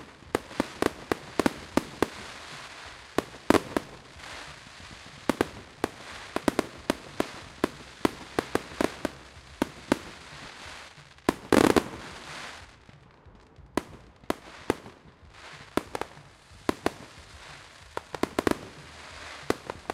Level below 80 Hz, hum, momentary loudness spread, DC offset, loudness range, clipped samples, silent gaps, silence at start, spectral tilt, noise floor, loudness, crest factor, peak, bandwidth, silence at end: -54 dBFS; none; 18 LU; under 0.1%; 8 LU; under 0.1%; none; 0 s; -4.5 dB/octave; -54 dBFS; -31 LUFS; 32 dB; 0 dBFS; 16 kHz; 0 s